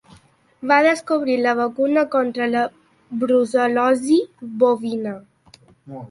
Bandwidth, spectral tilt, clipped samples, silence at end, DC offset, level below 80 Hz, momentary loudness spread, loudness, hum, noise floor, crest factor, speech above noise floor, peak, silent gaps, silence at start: 11.5 kHz; -5 dB/octave; under 0.1%; 0.05 s; under 0.1%; -66 dBFS; 15 LU; -19 LUFS; none; -52 dBFS; 18 dB; 34 dB; -2 dBFS; none; 0.6 s